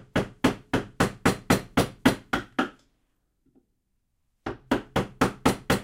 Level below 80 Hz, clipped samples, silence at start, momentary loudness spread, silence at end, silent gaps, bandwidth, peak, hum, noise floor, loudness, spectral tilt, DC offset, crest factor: -46 dBFS; under 0.1%; 0.15 s; 7 LU; 0 s; none; 16.5 kHz; -6 dBFS; none; -74 dBFS; -27 LUFS; -5 dB/octave; under 0.1%; 22 dB